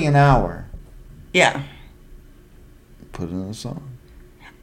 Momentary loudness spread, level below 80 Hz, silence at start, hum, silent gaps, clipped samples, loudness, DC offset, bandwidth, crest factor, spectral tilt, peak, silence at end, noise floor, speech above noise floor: 25 LU; -36 dBFS; 0 s; none; none; under 0.1%; -20 LUFS; under 0.1%; 11.5 kHz; 22 dB; -5.5 dB/octave; 0 dBFS; 0.15 s; -47 dBFS; 28 dB